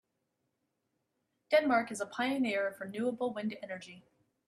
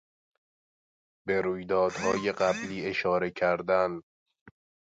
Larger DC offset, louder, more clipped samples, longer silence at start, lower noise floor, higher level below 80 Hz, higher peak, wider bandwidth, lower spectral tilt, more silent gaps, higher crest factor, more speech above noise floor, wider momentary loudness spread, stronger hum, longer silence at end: neither; second, -33 LUFS vs -28 LUFS; neither; first, 1.5 s vs 1.25 s; second, -82 dBFS vs under -90 dBFS; second, -80 dBFS vs -62 dBFS; about the same, -14 dBFS vs -12 dBFS; first, 13.5 kHz vs 9 kHz; about the same, -4.5 dB/octave vs -5 dB/octave; second, none vs 4.03-4.26 s, 4.41-4.46 s; about the same, 22 dB vs 18 dB; second, 49 dB vs over 62 dB; first, 15 LU vs 5 LU; neither; first, 0.5 s vs 0.35 s